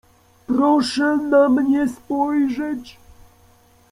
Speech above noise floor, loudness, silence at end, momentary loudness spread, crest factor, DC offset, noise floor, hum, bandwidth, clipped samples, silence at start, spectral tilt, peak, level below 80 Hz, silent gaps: 35 dB; -19 LUFS; 1 s; 9 LU; 16 dB; under 0.1%; -53 dBFS; none; 12 kHz; under 0.1%; 0.5 s; -5 dB/octave; -4 dBFS; -56 dBFS; none